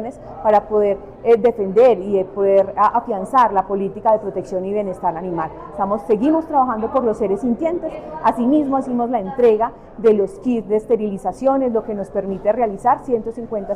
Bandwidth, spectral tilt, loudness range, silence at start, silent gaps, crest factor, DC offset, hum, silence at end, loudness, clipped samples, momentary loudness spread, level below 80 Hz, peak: 11 kHz; -8 dB/octave; 4 LU; 0 s; none; 14 dB; under 0.1%; none; 0 s; -18 LUFS; under 0.1%; 9 LU; -46 dBFS; -4 dBFS